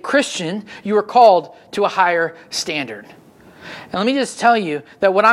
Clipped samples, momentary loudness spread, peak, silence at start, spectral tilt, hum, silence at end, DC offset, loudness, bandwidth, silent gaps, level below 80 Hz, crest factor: under 0.1%; 16 LU; 0 dBFS; 0.05 s; -3.5 dB/octave; none; 0 s; under 0.1%; -17 LUFS; 13.5 kHz; none; -64 dBFS; 18 dB